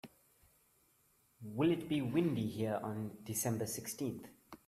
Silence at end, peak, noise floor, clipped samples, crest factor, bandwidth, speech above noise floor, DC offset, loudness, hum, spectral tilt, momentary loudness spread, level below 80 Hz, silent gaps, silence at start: 0.1 s; -20 dBFS; -73 dBFS; under 0.1%; 18 dB; 16 kHz; 36 dB; under 0.1%; -38 LUFS; none; -5.5 dB/octave; 16 LU; -72 dBFS; none; 0.05 s